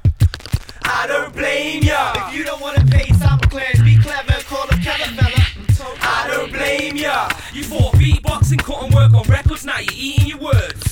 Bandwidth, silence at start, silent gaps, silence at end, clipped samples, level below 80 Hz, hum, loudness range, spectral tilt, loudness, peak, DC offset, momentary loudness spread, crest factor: 17 kHz; 0.05 s; none; 0 s; under 0.1%; -24 dBFS; none; 3 LU; -5.5 dB/octave; -16 LUFS; -2 dBFS; under 0.1%; 8 LU; 14 dB